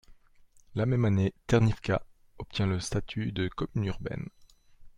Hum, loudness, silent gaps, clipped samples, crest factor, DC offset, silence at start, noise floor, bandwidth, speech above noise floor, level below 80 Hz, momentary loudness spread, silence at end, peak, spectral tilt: none; -30 LUFS; none; under 0.1%; 20 dB; under 0.1%; 0.1 s; -58 dBFS; 11 kHz; 30 dB; -48 dBFS; 12 LU; 0.1 s; -12 dBFS; -6.5 dB/octave